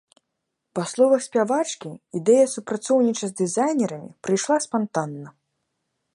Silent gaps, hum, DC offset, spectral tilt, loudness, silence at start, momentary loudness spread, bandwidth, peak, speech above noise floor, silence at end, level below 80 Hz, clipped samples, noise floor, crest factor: none; none; under 0.1%; -5 dB/octave; -22 LUFS; 0.75 s; 14 LU; 11.5 kHz; -6 dBFS; 58 dB; 0.85 s; -74 dBFS; under 0.1%; -79 dBFS; 16 dB